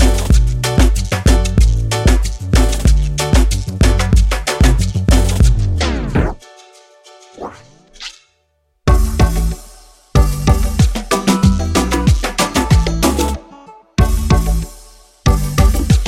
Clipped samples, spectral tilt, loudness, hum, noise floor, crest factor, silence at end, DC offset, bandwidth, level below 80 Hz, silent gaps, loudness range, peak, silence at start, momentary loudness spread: under 0.1%; -5.5 dB/octave; -15 LUFS; none; -62 dBFS; 14 dB; 0 s; under 0.1%; 15.5 kHz; -16 dBFS; none; 6 LU; 0 dBFS; 0 s; 9 LU